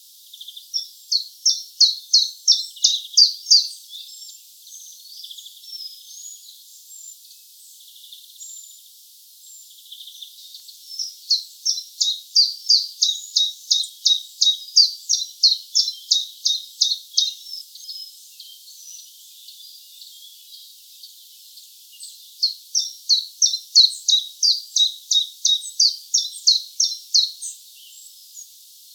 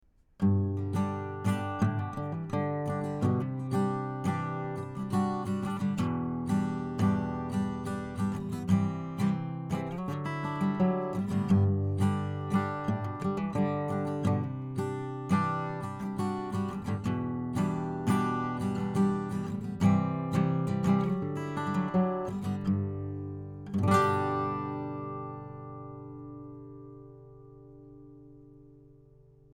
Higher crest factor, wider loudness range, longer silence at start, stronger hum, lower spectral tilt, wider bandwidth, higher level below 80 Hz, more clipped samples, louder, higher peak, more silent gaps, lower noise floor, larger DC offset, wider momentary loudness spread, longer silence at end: first, 24 dB vs 18 dB; first, 23 LU vs 3 LU; about the same, 0.4 s vs 0.4 s; neither; second, 13 dB/octave vs -8 dB/octave; first, over 20 kHz vs 12.5 kHz; second, under -90 dBFS vs -58 dBFS; neither; first, -17 LUFS vs -31 LUFS; first, 0 dBFS vs -12 dBFS; neither; second, -48 dBFS vs -58 dBFS; neither; first, 25 LU vs 10 LU; second, 0.5 s vs 0.65 s